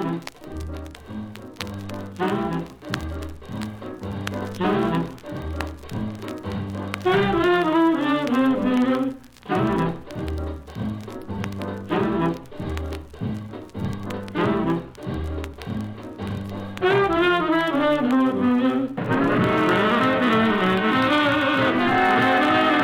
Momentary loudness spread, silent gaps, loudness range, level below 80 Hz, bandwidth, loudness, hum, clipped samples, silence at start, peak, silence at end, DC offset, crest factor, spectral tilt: 15 LU; none; 9 LU; -44 dBFS; 17 kHz; -23 LUFS; none; under 0.1%; 0 s; -6 dBFS; 0 s; under 0.1%; 16 dB; -6.5 dB/octave